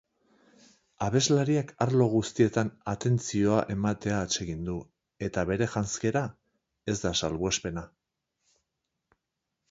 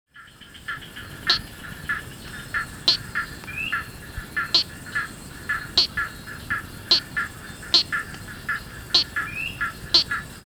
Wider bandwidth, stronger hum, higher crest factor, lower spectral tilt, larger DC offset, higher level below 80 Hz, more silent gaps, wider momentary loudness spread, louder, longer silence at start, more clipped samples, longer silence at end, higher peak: second, 8 kHz vs over 20 kHz; neither; about the same, 20 dB vs 24 dB; first, -5 dB/octave vs -1.5 dB/octave; neither; second, -52 dBFS vs -46 dBFS; neither; second, 11 LU vs 17 LU; second, -28 LUFS vs -23 LUFS; first, 1 s vs 0.15 s; neither; first, 1.85 s vs 0.05 s; second, -10 dBFS vs -2 dBFS